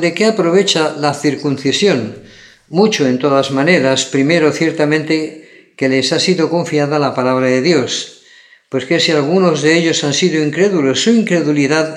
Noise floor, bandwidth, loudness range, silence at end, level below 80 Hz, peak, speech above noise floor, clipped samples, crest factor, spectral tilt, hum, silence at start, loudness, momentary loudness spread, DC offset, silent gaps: -45 dBFS; 12.5 kHz; 2 LU; 0 s; -64 dBFS; 0 dBFS; 32 dB; under 0.1%; 14 dB; -4.5 dB/octave; none; 0 s; -13 LUFS; 6 LU; under 0.1%; none